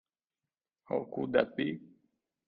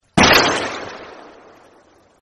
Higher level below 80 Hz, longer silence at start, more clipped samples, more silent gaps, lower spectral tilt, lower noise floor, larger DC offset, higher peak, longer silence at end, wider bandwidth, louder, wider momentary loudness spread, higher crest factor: second, -74 dBFS vs -42 dBFS; first, 0.9 s vs 0.15 s; neither; neither; first, -9 dB/octave vs -3 dB/octave; first, under -90 dBFS vs -52 dBFS; neither; second, -14 dBFS vs 0 dBFS; second, 0.6 s vs 1.05 s; second, 5 kHz vs 13 kHz; second, -33 LUFS vs -14 LUFS; second, 7 LU vs 22 LU; about the same, 22 dB vs 20 dB